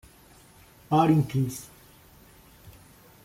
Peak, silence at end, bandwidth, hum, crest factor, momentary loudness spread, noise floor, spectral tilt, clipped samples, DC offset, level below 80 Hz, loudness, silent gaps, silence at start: -8 dBFS; 0.55 s; 16 kHz; none; 20 dB; 19 LU; -54 dBFS; -7 dB/octave; under 0.1%; under 0.1%; -58 dBFS; -24 LUFS; none; 0.9 s